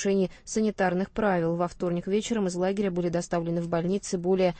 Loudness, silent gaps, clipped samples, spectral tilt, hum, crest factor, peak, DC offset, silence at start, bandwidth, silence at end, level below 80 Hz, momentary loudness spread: -27 LUFS; none; under 0.1%; -6 dB/octave; none; 16 dB; -10 dBFS; under 0.1%; 0 s; 8.8 kHz; 0 s; -52 dBFS; 3 LU